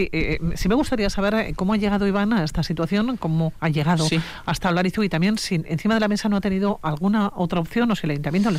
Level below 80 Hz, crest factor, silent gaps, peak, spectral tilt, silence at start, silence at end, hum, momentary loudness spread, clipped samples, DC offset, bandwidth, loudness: -38 dBFS; 10 dB; none; -10 dBFS; -6 dB/octave; 0 s; 0 s; none; 4 LU; under 0.1%; under 0.1%; 15.5 kHz; -22 LUFS